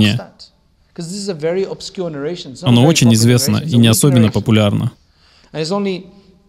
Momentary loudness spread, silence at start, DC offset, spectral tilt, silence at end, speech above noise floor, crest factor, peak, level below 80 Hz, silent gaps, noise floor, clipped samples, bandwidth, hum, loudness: 14 LU; 0 s; under 0.1%; -5.5 dB/octave; 0.45 s; 39 dB; 14 dB; 0 dBFS; -48 dBFS; none; -53 dBFS; under 0.1%; 15.5 kHz; none; -14 LUFS